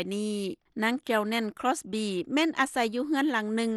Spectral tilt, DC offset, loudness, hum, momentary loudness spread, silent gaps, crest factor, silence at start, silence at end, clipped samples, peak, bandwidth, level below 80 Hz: -4 dB/octave; under 0.1%; -29 LUFS; none; 5 LU; none; 18 dB; 0 s; 0 s; under 0.1%; -12 dBFS; 12.5 kHz; -72 dBFS